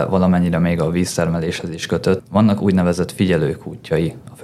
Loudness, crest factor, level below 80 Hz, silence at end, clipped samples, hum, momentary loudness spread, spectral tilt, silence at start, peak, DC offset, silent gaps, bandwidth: -18 LUFS; 14 dB; -42 dBFS; 0 s; under 0.1%; none; 8 LU; -6.5 dB/octave; 0 s; -4 dBFS; under 0.1%; none; 13.5 kHz